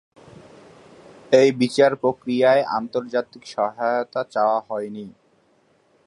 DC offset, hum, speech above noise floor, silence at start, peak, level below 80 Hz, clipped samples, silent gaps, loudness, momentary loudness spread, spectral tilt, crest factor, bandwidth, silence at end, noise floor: under 0.1%; none; 41 dB; 1.3 s; -2 dBFS; -68 dBFS; under 0.1%; none; -21 LUFS; 13 LU; -5.5 dB/octave; 20 dB; 11.5 kHz; 0.95 s; -61 dBFS